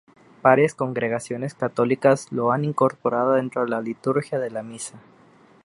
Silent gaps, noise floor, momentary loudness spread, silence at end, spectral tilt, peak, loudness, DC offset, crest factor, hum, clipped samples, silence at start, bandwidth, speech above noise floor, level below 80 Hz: none; -53 dBFS; 12 LU; 0.65 s; -6.5 dB/octave; -2 dBFS; -22 LUFS; under 0.1%; 20 dB; none; under 0.1%; 0.45 s; 11.5 kHz; 31 dB; -68 dBFS